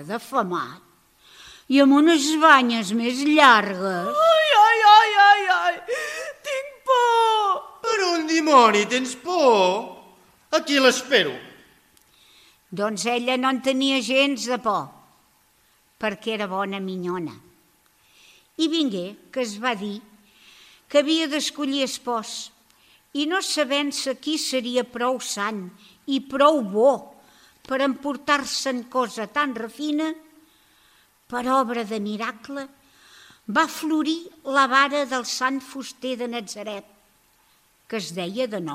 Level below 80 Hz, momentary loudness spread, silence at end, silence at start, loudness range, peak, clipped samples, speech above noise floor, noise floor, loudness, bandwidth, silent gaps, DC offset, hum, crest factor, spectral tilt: -70 dBFS; 17 LU; 0 s; 0 s; 12 LU; 0 dBFS; under 0.1%; 39 dB; -61 dBFS; -21 LUFS; 15.5 kHz; none; under 0.1%; none; 22 dB; -3 dB/octave